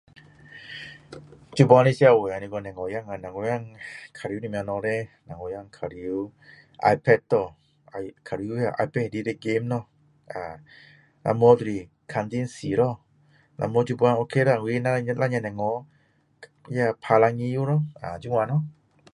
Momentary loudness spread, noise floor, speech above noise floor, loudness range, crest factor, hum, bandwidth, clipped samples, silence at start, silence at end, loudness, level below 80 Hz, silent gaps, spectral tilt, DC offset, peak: 20 LU; -60 dBFS; 36 dB; 8 LU; 24 dB; none; 11 kHz; under 0.1%; 0.5 s; 0.4 s; -24 LUFS; -60 dBFS; none; -7.5 dB/octave; under 0.1%; -2 dBFS